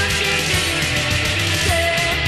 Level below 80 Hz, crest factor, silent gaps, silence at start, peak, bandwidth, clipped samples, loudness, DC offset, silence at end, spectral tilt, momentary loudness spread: -32 dBFS; 14 dB; none; 0 s; -6 dBFS; 14 kHz; under 0.1%; -17 LUFS; 0.4%; 0 s; -3 dB/octave; 1 LU